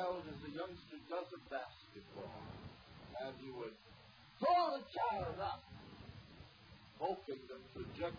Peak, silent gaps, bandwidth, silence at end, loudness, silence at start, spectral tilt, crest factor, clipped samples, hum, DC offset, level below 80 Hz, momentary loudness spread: -24 dBFS; none; 5.2 kHz; 0 s; -43 LUFS; 0 s; -4 dB/octave; 20 dB; under 0.1%; none; under 0.1%; -68 dBFS; 20 LU